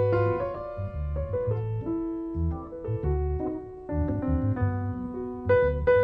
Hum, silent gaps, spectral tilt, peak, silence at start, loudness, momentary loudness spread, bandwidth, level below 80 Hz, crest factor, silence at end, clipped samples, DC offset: none; none; -11 dB/octave; -12 dBFS; 0 s; -29 LUFS; 10 LU; 5 kHz; -36 dBFS; 16 dB; 0 s; under 0.1%; under 0.1%